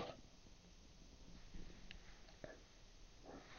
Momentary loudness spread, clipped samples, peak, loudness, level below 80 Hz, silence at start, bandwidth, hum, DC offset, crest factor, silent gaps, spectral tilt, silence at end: 6 LU; under 0.1%; -34 dBFS; -61 LUFS; -62 dBFS; 0 s; 16 kHz; none; under 0.1%; 24 dB; none; -4 dB/octave; 0 s